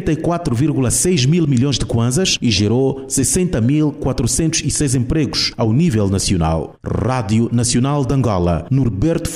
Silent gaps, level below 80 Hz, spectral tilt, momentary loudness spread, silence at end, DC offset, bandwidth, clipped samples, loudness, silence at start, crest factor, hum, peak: none; -32 dBFS; -5 dB/octave; 4 LU; 0 s; 0.1%; 16 kHz; under 0.1%; -16 LUFS; 0 s; 12 dB; none; -4 dBFS